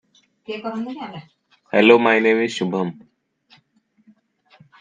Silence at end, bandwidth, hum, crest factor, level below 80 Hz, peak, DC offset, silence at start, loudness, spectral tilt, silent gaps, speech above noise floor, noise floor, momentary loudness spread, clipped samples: 1.9 s; 9.4 kHz; none; 22 dB; -74 dBFS; 0 dBFS; under 0.1%; 0.5 s; -18 LUFS; -5.5 dB/octave; none; 44 dB; -62 dBFS; 20 LU; under 0.1%